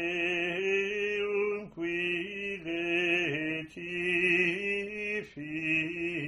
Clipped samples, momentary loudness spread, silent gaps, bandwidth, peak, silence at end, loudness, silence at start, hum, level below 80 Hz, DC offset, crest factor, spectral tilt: under 0.1%; 9 LU; none; 10.5 kHz; -16 dBFS; 0 s; -30 LUFS; 0 s; none; -66 dBFS; under 0.1%; 16 dB; -5 dB/octave